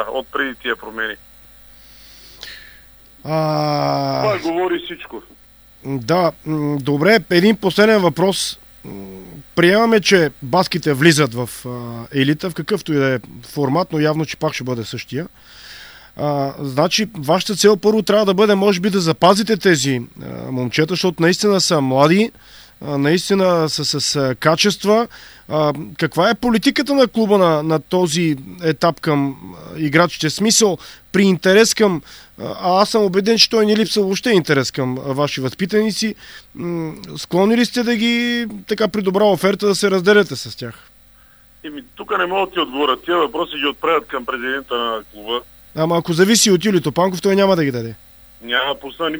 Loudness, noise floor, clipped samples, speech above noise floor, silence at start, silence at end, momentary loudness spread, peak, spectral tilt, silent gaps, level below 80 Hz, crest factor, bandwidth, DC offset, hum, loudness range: -17 LUFS; -48 dBFS; under 0.1%; 31 dB; 0 s; 0 s; 16 LU; 0 dBFS; -4.5 dB/octave; none; -52 dBFS; 18 dB; over 20 kHz; under 0.1%; none; 6 LU